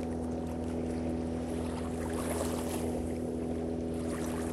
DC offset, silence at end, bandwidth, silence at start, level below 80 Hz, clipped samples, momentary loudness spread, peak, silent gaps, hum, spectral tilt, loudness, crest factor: under 0.1%; 0 s; 13.5 kHz; 0 s; -46 dBFS; under 0.1%; 2 LU; -20 dBFS; none; none; -6 dB/octave; -35 LUFS; 14 dB